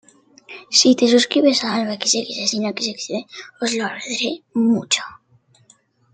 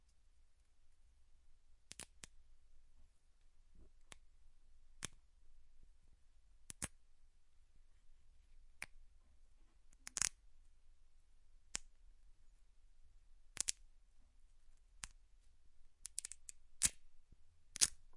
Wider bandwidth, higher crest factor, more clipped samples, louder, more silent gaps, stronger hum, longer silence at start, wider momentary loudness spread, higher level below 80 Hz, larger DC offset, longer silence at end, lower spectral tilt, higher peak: second, 9.4 kHz vs 11.5 kHz; second, 20 dB vs 42 dB; neither; first, -18 LUFS vs -42 LUFS; neither; neither; first, 0.5 s vs 0 s; second, 14 LU vs 23 LU; about the same, -68 dBFS vs -64 dBFS; neither; first, 1 s vs 0 s; first, -2.5 dB/octave vs 0.5 dB/octave; first, -2 dBFS vs -10 dBFS